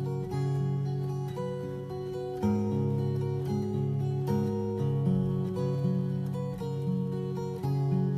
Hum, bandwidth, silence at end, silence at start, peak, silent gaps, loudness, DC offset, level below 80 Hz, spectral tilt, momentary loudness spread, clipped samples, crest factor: none; 7.6 kHz; 0 s; 0 s; -16 dBFS; none; -31 LUFS; under 0.1%; -56 dBFS; -9.5 dB/octave; 6 LU; under 0.1%; 14 dB